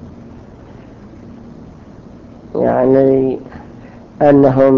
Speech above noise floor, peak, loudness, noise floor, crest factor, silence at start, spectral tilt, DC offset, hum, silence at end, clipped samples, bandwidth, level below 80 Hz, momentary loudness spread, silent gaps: 26 dB; 0 dBFS; -13 LUFS; -37 dBFS; 16 dB; 0 s; -10.5 dB/octave; under 0.1%; none; 0 s; under 0.1%; 5.6 kHz; -44 dBFS; 27 LU; none